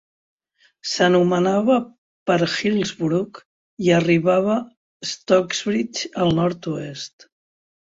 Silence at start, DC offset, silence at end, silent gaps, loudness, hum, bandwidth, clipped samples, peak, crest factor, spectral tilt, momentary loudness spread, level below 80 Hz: 0.85 s; under 0.1%; 0.85 s; 1.98-2.26 s, 3.45-3.77 s, 4.77-5.00 s; -20 LUFS; none; 8 kHz; under 0.1%; -2 dBFS; 18 dB; -5.5 dB/octave; 15 LU; -58 dBFS